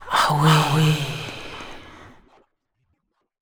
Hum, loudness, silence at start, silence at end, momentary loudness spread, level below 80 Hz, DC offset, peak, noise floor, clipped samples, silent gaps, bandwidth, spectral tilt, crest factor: none; -19 LUFS; 0 s; 1.45 s; 21 LU; -50 dBFS; under 0.1%; -4 dBFS; -72 dBFS; under 0.1%; none; over 20 kHz; -5 dB/octave; 18 dB